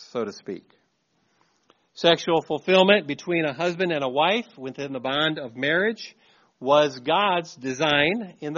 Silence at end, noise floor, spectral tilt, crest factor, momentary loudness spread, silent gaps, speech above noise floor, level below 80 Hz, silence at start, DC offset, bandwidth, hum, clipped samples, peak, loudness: 0 s; -69 dBFS; -2 dB/octave; 22 dB; 14 LU; none; 46 dB; -66 dBFS; 0 s; under 0.1%; 7.2 kHz; none; under 0.1%; -2 dBFS; -23 LUFS